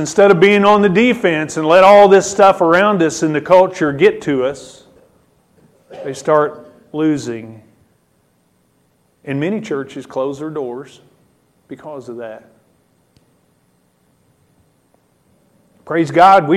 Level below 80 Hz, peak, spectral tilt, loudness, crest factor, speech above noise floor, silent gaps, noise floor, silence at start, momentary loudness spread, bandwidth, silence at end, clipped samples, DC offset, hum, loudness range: -56 dBFS; 0 dBFS; -5 dB/octave; -13 LUFS; 16 dB; 46 dB; none; -59 dBFS; 0 s; 21 LU; 13 kHz; 0 s; under 0.1%; under 0.1%; none; 23 LU